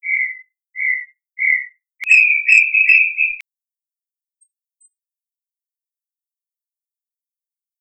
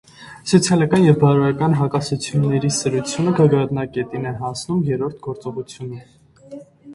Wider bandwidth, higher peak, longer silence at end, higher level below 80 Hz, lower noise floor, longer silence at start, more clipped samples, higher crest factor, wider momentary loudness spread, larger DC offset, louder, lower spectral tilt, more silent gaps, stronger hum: second, 9 kHz vs 11.5 kHz; about the same, 0 dBFS vs 0 dBFS; first, 4.4 s vs 0 s; second, -80 dBFS vs -52 dBFS; first, under -90 dBFS vs -39 dBFS; second, 0.05 s vs 0.2 s; neither; about the same, 20 dB vs 18 dB; first, 20 LU vs 17 LU; neither; first, -13 LUFS vs -18 LUFS; second, 6 dB/octave vs -6 dB/octave; neither; neither